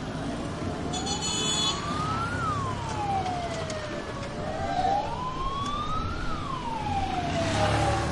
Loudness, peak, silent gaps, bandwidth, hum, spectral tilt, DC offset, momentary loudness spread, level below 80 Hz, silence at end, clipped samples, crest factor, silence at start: -29 LUFS; -12 dBFS; none; 11.5 kHz; none; -4 dB/octave; under 0.1%; 8 LU; -42 dBFS; 0 s; under 0.1%; 16 dB; 0 s